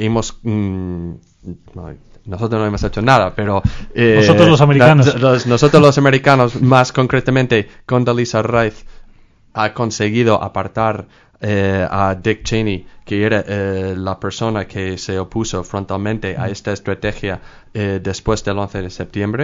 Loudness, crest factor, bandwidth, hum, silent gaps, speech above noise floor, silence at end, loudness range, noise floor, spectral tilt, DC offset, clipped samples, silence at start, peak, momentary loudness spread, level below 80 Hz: -15 LUFS; 16 dB; 9 kHz; none; none; 31 dB; 0 s; 11 LU; -46 dBFS; -6 dB/octave; under 0.1%; 0.3%; 0 s; 0 dBFS; 16 LU; -36 dBFS